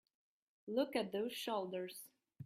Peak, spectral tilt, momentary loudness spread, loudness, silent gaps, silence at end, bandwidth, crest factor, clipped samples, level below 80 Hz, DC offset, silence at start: -24 dBFS; -4.5 dB/octave; 17 LU; -41 LUFS; none; 0 s; 16 kHz; 20 dB; under 0.1%; -86 dBFS; under 0.1%; 0.65 s